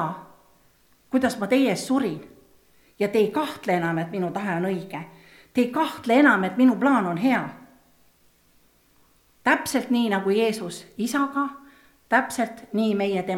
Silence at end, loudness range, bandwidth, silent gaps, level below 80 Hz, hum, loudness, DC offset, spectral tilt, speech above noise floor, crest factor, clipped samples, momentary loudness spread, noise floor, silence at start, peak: 0 s; 4 LU; 16 kHz; none; -66 dBFS; none; -23 LUFS; under 0.1%; -5.5 dB/octave; 38 dB; 20 dB; under 0.1%; 12 LU; -61 dBFS; 0 s; -4 dBFS